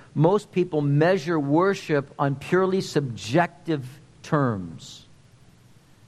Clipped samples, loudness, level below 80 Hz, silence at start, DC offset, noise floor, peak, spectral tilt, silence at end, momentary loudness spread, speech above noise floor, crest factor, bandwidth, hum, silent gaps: under 0.1%; -24 LUFS; -62 dBFS; 0.15 s; under 0.1%; -53 dBFS; -6 dBFS; -7 dB/octave; 1.1 s; 13 LU; 30 dB; 18 dB; 12.5 kHz; none; none